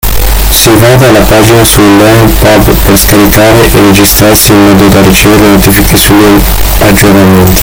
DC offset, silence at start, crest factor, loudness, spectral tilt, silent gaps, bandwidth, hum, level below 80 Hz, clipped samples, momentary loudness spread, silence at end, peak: under 0.1%; 0.05 s; 2 dB; -2 LUFS; -4.5 dB/octave; none; over 20 kHz; none; -12 dBFS; 20%; 2 LU; 0 s; 0 dBFS